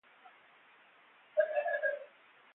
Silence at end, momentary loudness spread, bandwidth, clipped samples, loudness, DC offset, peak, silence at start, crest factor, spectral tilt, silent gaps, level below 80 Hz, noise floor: 0.5 s; 13 LU; 4 kHz; under 0.1%; -35 LUFS; under 0.1%; -18 dBFS; 0.25 s; 20 dB; 2 dB/octave; none; under -90 dBFS; -63 dBFS